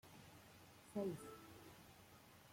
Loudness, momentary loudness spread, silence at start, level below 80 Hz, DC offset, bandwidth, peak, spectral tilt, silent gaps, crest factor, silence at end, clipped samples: -53 LUFS; 17 LU; 0.05 s; -80 dBFS; under 0.1%; 16.5 kHz; -32 dBFS; -6 dB/octave; none; 20 dB; 0 s; under 0.1%